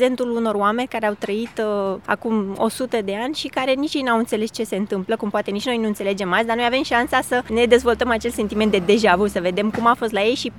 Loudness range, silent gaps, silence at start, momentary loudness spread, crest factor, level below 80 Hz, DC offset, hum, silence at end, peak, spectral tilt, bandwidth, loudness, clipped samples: 4 LU; none; 0 s; 7 LU; 18 dB; -48 dBFS; 0.1%; none; 0 s; -2 dBFS; -4.5 dB/octave; 17 kHz; -20 LUFS; under 0.1%